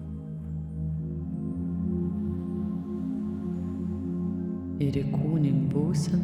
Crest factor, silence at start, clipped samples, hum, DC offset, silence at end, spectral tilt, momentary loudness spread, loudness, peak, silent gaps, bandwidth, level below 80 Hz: 16 dB; 0 s; under 0.1%; none; under 0.1%; 0 s; -8.5 dB/octave; 8 LU; -30 LUFS; -14 dBFS; none; 11 kHz; -46 dBFS